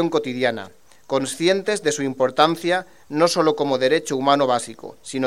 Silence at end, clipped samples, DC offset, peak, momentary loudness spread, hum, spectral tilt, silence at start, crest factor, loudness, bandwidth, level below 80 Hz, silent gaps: 0 s; under 0.1%; 0.3%; 0 dBFS; 12 LU; none; -4 dB/octave; 0 s; 20 dB; -20 LUFS; 15 kHz; -66 dBFS; none